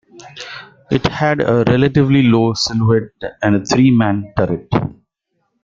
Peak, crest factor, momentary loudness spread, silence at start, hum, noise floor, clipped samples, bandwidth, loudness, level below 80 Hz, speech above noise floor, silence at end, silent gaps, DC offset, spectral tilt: -2 dBFS; 14 dB; 17 LU; 0.15 s; none; -69 dBFS; under 0.1%; 7.6 kHz; -15 LUFS; -44 dBFS; 55 dB; 0.7 s; none; under 0.1%; -6.5 dB/octave